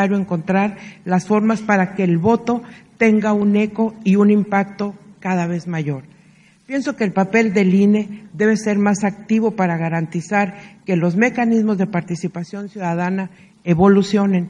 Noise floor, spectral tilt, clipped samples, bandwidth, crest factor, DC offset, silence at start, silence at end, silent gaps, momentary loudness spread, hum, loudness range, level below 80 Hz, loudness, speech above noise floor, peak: -50 dBFS; -7 dB/octave; under 0.1%; 9.4 kHz; 18 dB; under 0.1%; 0 s; 0 s; none; 11 LU; none; 3 LU; -56 dBFS; -18 LUFS; 33 dB; 0 dBFS